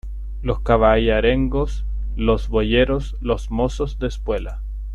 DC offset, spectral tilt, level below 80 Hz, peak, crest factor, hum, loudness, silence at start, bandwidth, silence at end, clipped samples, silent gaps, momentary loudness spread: under 0.1%; -7 dB/octave; -26 dBFS; -2 dBFS; 16 dB; none; -20 LUFS; 0.05 s; 8 kHz; 0 s; under 0.1%; none; 12 LU